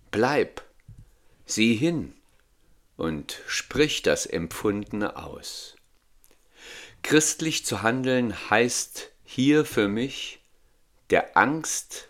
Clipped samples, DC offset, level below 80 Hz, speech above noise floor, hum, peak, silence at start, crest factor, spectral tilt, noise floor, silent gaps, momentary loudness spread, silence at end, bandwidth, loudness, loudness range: under 0.1%; under 0.1%; -56 dBFS; 36 dB; none; -2 dBFS; 0.15 s; 24 dB; -3.5 dB/octave; -61 dBFS; none; 15 LU; 0.05 s; 16.5 kHz; -25 LUFS; 5 LU